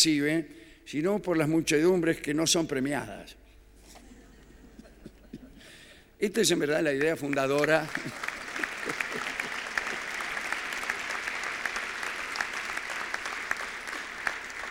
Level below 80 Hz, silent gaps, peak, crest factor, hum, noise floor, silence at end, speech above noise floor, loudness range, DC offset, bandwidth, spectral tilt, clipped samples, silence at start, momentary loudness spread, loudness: -58 dBFS; none; -8 dBFS; 22 dB; none; -54 dBFS; 0 s; 26 dB; 5 LU; under 0.1%; 17 kHz; -3.5 dB/octave; under 0.1%; 0 s; 12 LU; -29 LUFS